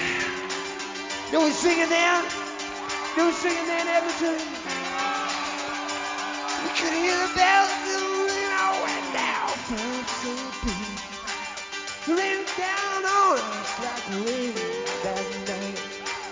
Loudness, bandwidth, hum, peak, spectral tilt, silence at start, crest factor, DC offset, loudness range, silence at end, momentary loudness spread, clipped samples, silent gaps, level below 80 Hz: -25 LUFS; 7.8 kHz; none; -6 dBFS; -2 dB/octave; 0 s; 20 dB; under 0.1%; 5 LU; 0 s; 11 LU; under 0.1%; none; -52 dBFS